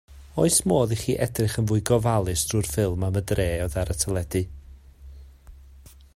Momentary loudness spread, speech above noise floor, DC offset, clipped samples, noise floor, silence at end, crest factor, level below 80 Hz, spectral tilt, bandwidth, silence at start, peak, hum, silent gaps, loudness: 7 LU; 25 dB; under 0.1%; under 0.1%; -48 dBFS; 0.35 s; 22 dB; -40 dBFS; -5 dB/octave; 16 kHz; 0.1 s; -2 dBFS; none; none; -24 LUFS